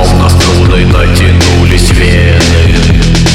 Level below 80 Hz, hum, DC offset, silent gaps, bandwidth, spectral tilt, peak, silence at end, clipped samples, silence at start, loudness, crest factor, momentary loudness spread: -12 dBFS; none; under 0.1%; none; 14.5 kHz; -5 dB/octave; 0 dBFS; 0 s; 0.2%; 0 s; -6 LUFS; 4 dB; 1 LU